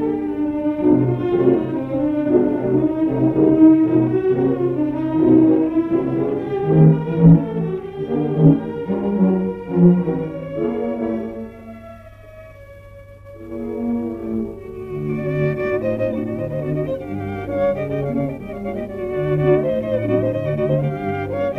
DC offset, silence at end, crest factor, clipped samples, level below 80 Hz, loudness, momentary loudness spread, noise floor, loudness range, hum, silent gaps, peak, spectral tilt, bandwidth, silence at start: under 0.1%; 0 s; 16 dB; under 0.1%; -44 dBFS; -19 LUFS; 13 LU; -40 dBFS; 12 LU; none; none; -2 dBFS; -11 dB/octave; 4 kHz; 0 s